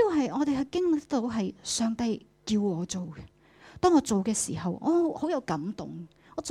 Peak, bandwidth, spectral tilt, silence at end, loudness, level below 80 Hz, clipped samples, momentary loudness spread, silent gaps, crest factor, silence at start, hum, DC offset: -12 dBFS; 14 kHz; -5 dB/octave; 0 s; -28 LUFS; -58 dBFS; under 0.1%; 14 LU; none; 18 dB; 0 s; none; under 0.1%